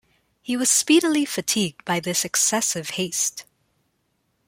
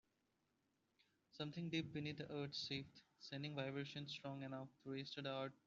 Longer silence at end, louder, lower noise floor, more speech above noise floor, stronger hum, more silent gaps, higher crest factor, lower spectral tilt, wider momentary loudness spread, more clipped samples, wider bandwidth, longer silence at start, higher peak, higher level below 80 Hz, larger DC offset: first, 1.05 s vs 0.1 s; first, -21 LUFS vs -49 LUFS; second, -71 dBFS vs -86 dBFS; first, 49 dB vs 37 dB; neither; neither; about the same, 18 dB vs 20 dB; second, -2 dB/octave vs -4 dB/octave; about the same, 9 LU vs 8 LU; neither; first, 16.5 kHz vs 7.4 kHz; second, 0.45 s vs 1.35 s; first, -6 dBFS vs -30 dBFS; first, -68 dBFS vs -82 dBFS; neither